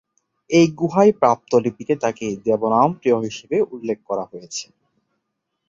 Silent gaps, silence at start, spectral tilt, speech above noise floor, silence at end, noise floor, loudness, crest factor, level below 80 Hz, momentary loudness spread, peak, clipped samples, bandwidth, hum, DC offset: none; 0.5 s; -6 dB/octave; 58 dB; 1.05 s; -77 dBFS; -19 LUFS; 18 dB; -62 dBFS; 12 LU; -2 dBFS; under 0.1%; 7.8 kHz; none; under 0.1%